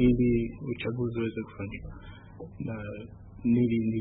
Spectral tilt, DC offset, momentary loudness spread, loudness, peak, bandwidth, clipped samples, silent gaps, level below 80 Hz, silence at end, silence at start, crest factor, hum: -12 dB/octave; under 0.1%; 21 LU; -30 LUFS; -12 dBFS; 4 kHz; under 0.1%; none; -46 dBFS; 0 s; 0 s; 18 dB; none